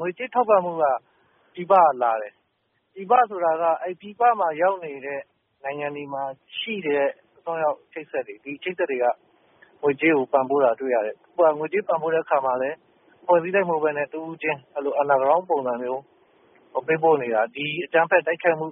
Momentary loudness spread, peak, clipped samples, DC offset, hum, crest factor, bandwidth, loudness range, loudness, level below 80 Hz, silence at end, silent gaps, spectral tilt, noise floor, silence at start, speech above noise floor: 13 LU; -4 dBFS; under 0.1%; under 0.1%; none; 18 dB; 3.8 kHz; 5 LU; -23 LUFS; -74 dBFS; 0 s; none; 0.5 dB/octave; -71 dBFS; 0 s; 49 dB